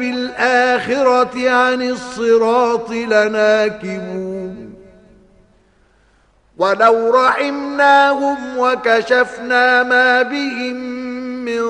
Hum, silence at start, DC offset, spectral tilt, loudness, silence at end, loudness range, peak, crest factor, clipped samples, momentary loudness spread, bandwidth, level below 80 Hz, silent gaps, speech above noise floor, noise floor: none; 0 s; under 0.1%; -4 dB/octave; -15 LUFS; 0 s; 7 LU; 0 dBFS; 16 dB; under 0.1%; 13 LU; 10.5 kHz; -56 dBFS; none; 40 dB; -54 dBFS